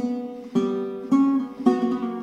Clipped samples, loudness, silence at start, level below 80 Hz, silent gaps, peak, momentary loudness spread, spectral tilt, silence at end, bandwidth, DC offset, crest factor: under 0.1%; -23 LUFS; 0 s; -66 dBFS; none; -6 dBFS; 9 LU; -7.5 dB/octave; 0 s; 8.2 kHz; under 0.1%; 18 dB